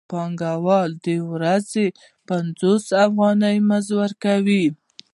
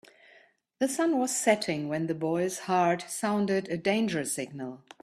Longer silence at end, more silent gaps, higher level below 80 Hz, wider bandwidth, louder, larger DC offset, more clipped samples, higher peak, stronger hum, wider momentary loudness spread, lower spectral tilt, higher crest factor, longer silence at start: first, 0.4 s vs 0.25 s; neither; about the same, -68 dBFS vs -72 dBFS; second, 11.5 kHz vs 15 kHz; first, -20 LUFS vs -28 LUFS; neither; neither; first, -4 dBFS vs -10 dBFS; neither; about the same, 8 LU vs 7 LU; first, -6.5 dB/octave vs -4.5 dB/octave; about the same, 16 dB vs 20 dB; second, 0.1 s vs 0.8 s